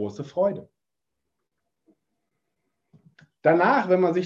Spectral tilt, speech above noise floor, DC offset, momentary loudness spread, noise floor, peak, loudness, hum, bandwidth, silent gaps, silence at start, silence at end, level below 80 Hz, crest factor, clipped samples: -7.5 dB/octave; 63 dB; under 0.1%; 10 LU; -85 dBFS; -6 dBFS; -22 LUFS; none; 7.4 kHz; none; 0 s; 0 s; -70 dBFS; 20 dB; under 0.1%